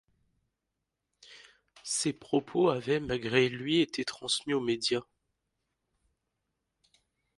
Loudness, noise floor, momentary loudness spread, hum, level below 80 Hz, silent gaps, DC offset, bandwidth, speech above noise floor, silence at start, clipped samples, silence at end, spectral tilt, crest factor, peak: -30 LUFS; -85 dBFS; 6 LU; none; -66 dBFS; none; under 0.1%; 11.5 kHz; 56 dB; 1.3 s; under 0.1%; 2.35 s; -4 dB/octave; 24 dB; -10 dBFS